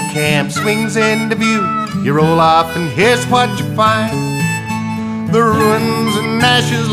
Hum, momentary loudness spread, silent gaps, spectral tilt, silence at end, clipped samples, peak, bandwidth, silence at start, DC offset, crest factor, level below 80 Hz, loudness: none; 6 LU; none; -5 dB/octave; 0 s; under 0.1%; 0 dBFS; 15.5 kHz; 0 s; under 0.1%; 14 dB; -46 dBFS; -13 LUFS